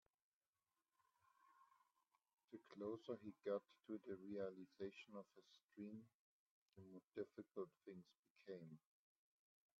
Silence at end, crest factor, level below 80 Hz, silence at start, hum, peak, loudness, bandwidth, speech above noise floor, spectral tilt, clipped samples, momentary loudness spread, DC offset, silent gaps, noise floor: 1 s; 22 dB; under -90 dBFS; 1.45 s; none; -36 dBFS; -55 LUFS; 7.2 kHz; over 35 dB; -6 dB/octave; under 0.1%; 14 LU; under 0.1%; 6.14-6.66 s, 8.19-8.23 s, 8.30-8.36 s; under -90 dBFS